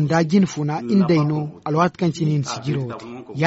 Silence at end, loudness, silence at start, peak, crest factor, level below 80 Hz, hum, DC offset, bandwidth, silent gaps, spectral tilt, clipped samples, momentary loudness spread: 0 s; -20 LUFS; 0 s; -4 dBFS; 16 dB; -56 dBFS; none; under 0.1%; 8 kHz; none; -7 dB/octave; under 0.1%; 9 LU